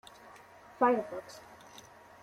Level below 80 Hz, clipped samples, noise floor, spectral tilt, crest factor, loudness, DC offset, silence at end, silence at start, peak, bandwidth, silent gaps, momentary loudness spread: -76 dBFS; under 0.1%; -55 dBFS; -5 dB/octave; 22 dB; -31 LUFS; under 0.1%; 0.8 s; 0.35 s; -14 dBFS; 16 kHz; none; 26 LU